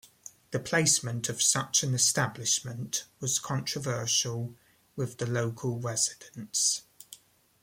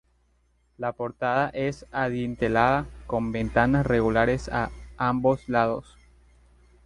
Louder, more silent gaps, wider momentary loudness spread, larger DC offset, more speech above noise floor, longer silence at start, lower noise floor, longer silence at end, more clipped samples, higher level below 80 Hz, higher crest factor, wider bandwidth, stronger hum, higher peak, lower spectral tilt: second, -28 LUFS vs -25 LUFS; neither; first, 14 LU vs 9 LU; neither; second, 25 dB vs 41 dB; second, 0.5 s vs 0.8 s; second, -55 dBFS vs -66 dBFS; second, 0.45 s vs 1.05 s; neither; second, -68 dBFS vs -44 dBFS; about the same, 22 dB vs 20 dB; first, 16.5 kHz vs 11.5 kHz; second, none vs 60 Hz at -40 dBFS; about the same, -8 dBFS vs -6 dBFS; second, -2.5 dB/octave vs -7.5 dB/octave